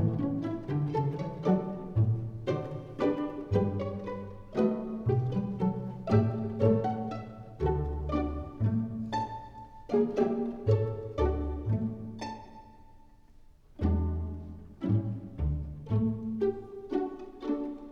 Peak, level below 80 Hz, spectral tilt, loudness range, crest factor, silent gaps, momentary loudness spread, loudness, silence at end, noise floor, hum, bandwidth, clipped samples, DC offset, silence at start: -12 dBFS; -42 dBFS; -9.5 dB/octave; 5 LU; 20 dB; none; 11 LU; -32 LUFS; 0 s; -55 dBFS; none; 6.8 kHz; under 0.1%; under 0.1%; 0 s